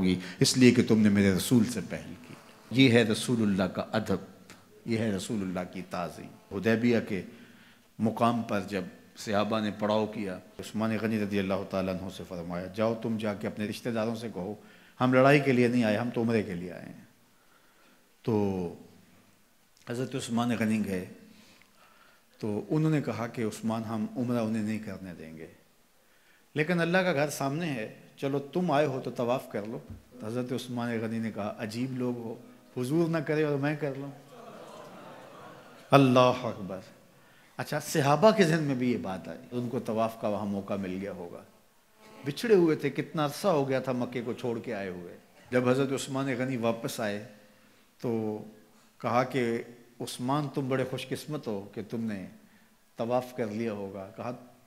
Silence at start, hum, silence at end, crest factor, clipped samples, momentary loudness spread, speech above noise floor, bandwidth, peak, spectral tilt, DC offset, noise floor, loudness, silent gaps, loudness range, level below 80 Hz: 0 s; none; 0.2 s; 26 dB; under 0.1%; 19 LU; 36 dB; 16 kHz; -4 dBFS; -6 dB/octave; under 0.1%; -65 dBFS; -29 LUFS; none; 7 LU; -68 dBFS